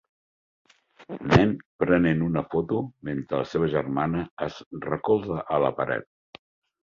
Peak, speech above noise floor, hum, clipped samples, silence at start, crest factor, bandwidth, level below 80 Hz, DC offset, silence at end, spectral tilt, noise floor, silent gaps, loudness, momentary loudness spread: -4 dBFS; over 65 dB; none; under 0.1%; 1 s; 22 dB; 7.4 kHz; -50 dBFS; under 0.1%; 0.8 s; -8 dB/octave; under -90 dBFS; 1.65-1.79 s, 4.31-4.37 s, 4.66-4.71 s; -26 LUFS; 12 LU